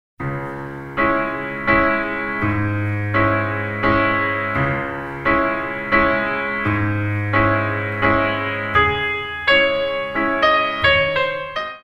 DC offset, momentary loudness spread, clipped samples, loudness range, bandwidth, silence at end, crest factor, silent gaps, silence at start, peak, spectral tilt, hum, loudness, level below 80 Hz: under 0.1%; 8 LU; under 0.1%; 2 LU; 7.8 kHz; 0.05 s; 18 dB; none; 0.2 s; 0 dBFS; -7 dB/octave; none; -18 LUFS; -40 dBFS